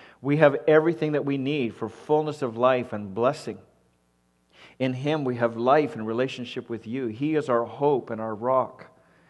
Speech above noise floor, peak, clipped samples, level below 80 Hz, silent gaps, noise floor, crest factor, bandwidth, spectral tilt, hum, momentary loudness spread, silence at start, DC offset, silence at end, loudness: 43 dB; -2 dBFS; under 0.1%; -68 dBFS; none; -67 dBFS; 24 dB; 11 kHz; -7.5 dB/octave; none; 13 LU; 0 s; under 0.1%; 0.45 s; -25 LUFS